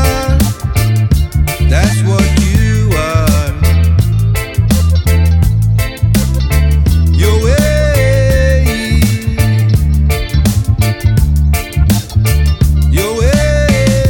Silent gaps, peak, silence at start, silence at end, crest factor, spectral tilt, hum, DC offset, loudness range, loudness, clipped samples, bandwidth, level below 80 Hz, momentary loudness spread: none; 0 dBFS; 0 s; 0 s; 10 dB; -6 dB/octave; none; under 0.1%; 1 LU; -11 LUFS; under 0.1%; 18.5 kHz; -14 dBFS; 3 LU